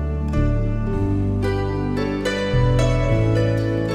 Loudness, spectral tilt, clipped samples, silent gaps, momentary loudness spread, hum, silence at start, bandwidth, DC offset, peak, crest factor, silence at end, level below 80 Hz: -21 LUFS; -7.5 dB/octave; under 0.1%; none; 4 LU; none; 0 s; 10.5 kHz; under 0.1%; -6 dBFS; 14 dB; 0 s; -26 dBFS